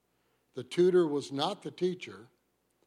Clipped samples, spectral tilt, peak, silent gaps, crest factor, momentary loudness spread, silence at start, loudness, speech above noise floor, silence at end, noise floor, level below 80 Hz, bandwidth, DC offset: under 0.1%; -6 dB/octave; -16 dBFS; none; 16 dB; 20 LU; 0.55 s; -30 LUFS; 45 dB; 0.65 s; -75 dBFS; -82 dBFS; 11 kHz; under 0.1%